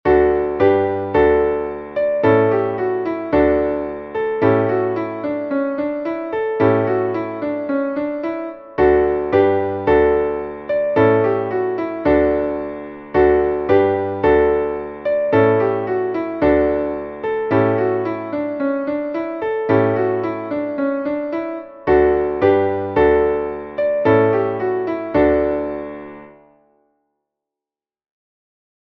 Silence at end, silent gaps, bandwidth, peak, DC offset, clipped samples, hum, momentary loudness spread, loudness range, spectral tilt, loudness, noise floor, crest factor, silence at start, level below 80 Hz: 2.5 s; none; 5.6 kHz; -2 dBFS; under 0.1%; under 0.1%; none; 9 LU; 4 LU; -9.5 dB/octave; -18 LUFS; -90 dBFS; 16 dB; 0.05 s; -40 dBFS